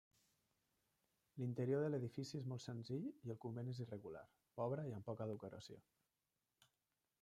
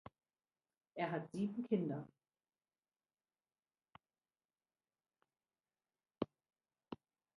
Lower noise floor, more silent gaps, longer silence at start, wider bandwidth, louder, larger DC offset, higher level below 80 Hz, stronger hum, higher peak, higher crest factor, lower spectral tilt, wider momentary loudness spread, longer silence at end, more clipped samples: about the same, under -90 dBFS vs under -90 dBFS; second, none vs 4.45-4.49 s; first, 1.35 s vs 0.95 s; first, 13 kHz vs 10 kHz; second, -47 LUFS vs -43 LUFS; neither; about the same, -84 dBFS vs -82 dBFS; neither; second, -30 dBFS vs -22 dBFS; second, 18 dB vs 26 dB; about the same, -7.5 dB/octave vs -8 dB/octave; about the same, 17 LU vs 17 LU; first, 1.4 s vs 0.4 s; neither